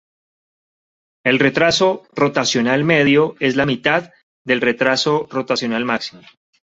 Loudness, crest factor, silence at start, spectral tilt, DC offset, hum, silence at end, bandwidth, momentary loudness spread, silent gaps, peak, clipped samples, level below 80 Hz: -17 LUFS; 18 dB; 1.25 s; -4.5 dB/octave; under 0.1%; none; 0.55 s; 8 kHz; 7 LU; 4.23-4.45 s; 0 dBFS; under 0.1%; -56 dBFS